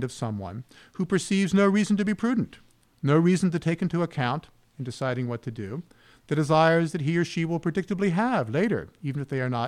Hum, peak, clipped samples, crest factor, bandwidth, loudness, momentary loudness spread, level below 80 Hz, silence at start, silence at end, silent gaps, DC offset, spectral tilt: none; -8 dBFS; under 0.1%; 16 dB; 12 kHz; -26 LUFS; 14 LU; -60 dBFS; 0 s; 0 s; none; under 0.1%; -6.5 dB/octave